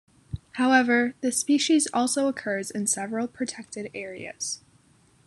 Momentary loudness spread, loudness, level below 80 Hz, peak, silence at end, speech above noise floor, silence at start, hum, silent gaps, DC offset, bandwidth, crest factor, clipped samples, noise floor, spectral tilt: 16 LU; -25 LUFS; -58 dBFS; -6 dBFS; 0.7 s; 35 dB; 0.3 s; none; none; under 0.1%; 12.5 kHz; 22 dB; under 0.1%; -60 dBFS; -3 dB/octave